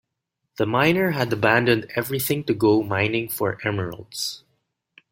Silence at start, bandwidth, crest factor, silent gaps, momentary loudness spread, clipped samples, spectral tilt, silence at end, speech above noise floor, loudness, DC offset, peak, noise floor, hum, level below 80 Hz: 0.6 s; 16.5 kHz; 20 dB; none; 10 LU; under 0.1%; -5 dB/octave; 0.75 s; 58 dB; -22 LUFS; under 0.1%; -2 dBFS; -79 dBFS; none; -58 dBFS